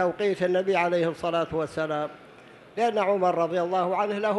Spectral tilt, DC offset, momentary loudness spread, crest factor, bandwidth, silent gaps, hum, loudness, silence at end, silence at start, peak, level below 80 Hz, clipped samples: -6 dB/octave; under 0.1%; 6 LU; 14 dB; 12 kHz; none; none; -26 LUFS; 0 s; 0 s; -10 dBFS; -62 dBFS; under 0.1%